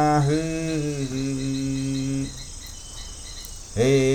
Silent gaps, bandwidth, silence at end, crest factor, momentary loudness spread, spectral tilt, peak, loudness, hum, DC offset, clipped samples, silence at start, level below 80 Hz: none; 18 kHz; 0 s; 16 dB; 16 LU; -5.5 dB/octave; -8 dBFS; -25 LUFS; none; under 0.1%; under 0.1%; 0 s; -40 dBFS